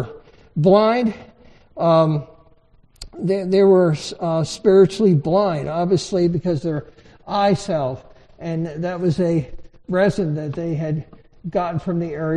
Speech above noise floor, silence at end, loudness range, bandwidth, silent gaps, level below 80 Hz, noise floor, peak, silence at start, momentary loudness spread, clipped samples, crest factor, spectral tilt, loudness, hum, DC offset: 34 dB; 0 s; 5 LU; 10.5 kHz; none; -48 dBFS; -53 dBFS; -2 dBFS; 0 s; 14 LU; under 0.1%; 16 dB; -7 dB/octave; -19 LUFS; none; under 0.1%